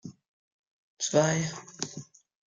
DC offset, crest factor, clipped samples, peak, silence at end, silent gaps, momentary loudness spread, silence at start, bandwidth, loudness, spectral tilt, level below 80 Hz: under 0.1%; 22 dB; under 0.1%; -10 dBFS; 0.45 s; 0.28-0.97 s; 18 LU; 0.05 s; 10 kHz; -29 LUFS; -4 dB/octave; -70 dBFS